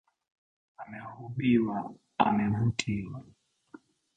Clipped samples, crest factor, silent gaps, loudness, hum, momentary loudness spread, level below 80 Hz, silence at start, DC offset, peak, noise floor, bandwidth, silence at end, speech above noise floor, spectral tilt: under 0.1%; 24 dB; none; -29 LUFS; none; 18 LU; -58 dBFS; 0.8 s; under 0.1%; -8 dBFS; -55 dBFS; 9 kHz; 0.95 s; 26 dB; -6.5 dB/octave